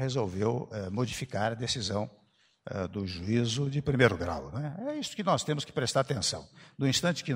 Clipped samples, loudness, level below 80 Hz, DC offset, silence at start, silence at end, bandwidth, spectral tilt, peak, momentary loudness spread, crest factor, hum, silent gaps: under 0.1%; -31 LUFS; -56 dBFS; under 0.1%; 0 s; 0 s; 16 kHz; -4.5 dB/octave; -6 dBFS; 10 LU; 24 dB; none; none